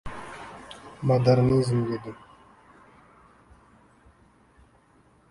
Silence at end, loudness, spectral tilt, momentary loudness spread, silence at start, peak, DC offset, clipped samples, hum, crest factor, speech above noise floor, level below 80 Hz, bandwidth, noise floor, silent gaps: 3.15 s; -23 LUFS; -8 dB/octave; 23 LU; 0.05 s; -8 dBFS; under 0.1%; under 0.1%; none; 20 dB; 37 dB; -54 dBFS; 11.5 kHz; -60 dBFS; none